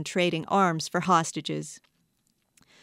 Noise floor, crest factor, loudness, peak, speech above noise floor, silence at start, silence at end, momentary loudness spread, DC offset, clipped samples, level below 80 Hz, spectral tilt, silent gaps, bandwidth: -72 dBFS; 20 dB; -26 LUFS; -8 dBFS; 46 dB; 0 s; 1.05 s; 11 LU; under 0.1%; under 0.1%; -72 dBFS; -4.5 dB/octave; none; 15.5 kHz